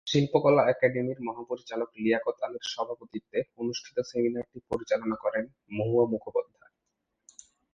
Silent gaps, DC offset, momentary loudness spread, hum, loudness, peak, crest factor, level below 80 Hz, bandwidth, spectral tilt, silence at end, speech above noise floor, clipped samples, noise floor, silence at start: none; under 0.1%; 13 LU; none; -29 LUFS; -8 dBFS; 20 dB; -66 dBFS; 7.8 kHz; -6 dB/octave; 1.3 s; 53 dB; under 0.1%; -82 dBFS; 0.05 s